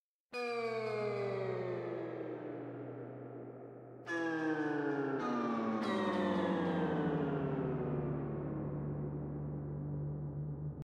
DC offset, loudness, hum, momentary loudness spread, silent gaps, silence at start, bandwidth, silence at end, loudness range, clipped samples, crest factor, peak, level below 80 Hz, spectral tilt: under 0.1%; -38 LUFS; none; 12 LU; none; 0.3 s; 9.6 kHz; 0.05 s; 6 LU; under 0.1%; 14 dB; -24 dBFS; -60 dBFS; -8 dB/octave